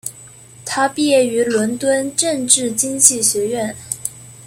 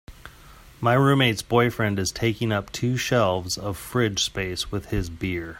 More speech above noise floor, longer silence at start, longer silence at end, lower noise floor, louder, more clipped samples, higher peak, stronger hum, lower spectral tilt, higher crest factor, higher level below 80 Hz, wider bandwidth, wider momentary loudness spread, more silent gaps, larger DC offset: about the same, 24 dB vs 24 dB; about the same, 0.05 s vs 0.1 s; about the same, 0 s vs 0 s; second, -41 dBFS vs -48 dBFS; first, -16 LUFS vs -23 LUFS; neither; first, 0 dBFS vs -6 dBFS; neither; second, -2 dB/octave vs -5 dB/octave; about the same, 18 dB vs 18 dB; second, -56 dBFS vs -44 dBFS; about the same, 16.5 kHz vs 16.5 kHz; first, 13 LU vs 10 LU; neither; neither